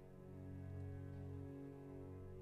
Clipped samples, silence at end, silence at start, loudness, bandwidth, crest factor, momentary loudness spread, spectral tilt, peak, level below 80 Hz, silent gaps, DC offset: under 0.1%; 0 s; 0 s; -53 LUFS; 10 kHz; 10 dB; 4 LU; -9.5 dB/octave; -42 dBFS; -66 dBFS; none; under 0.1%